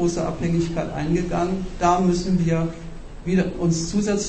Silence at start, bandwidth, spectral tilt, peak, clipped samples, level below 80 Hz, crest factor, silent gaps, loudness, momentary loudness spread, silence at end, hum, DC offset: 0 s; 8.8 kHz; -6 dB/octave; -6 dBFS; under 0.1%; -36 dBFS; 16 dB; none; -22 LUFS; 7 LU; 0 s; none; under 0.1%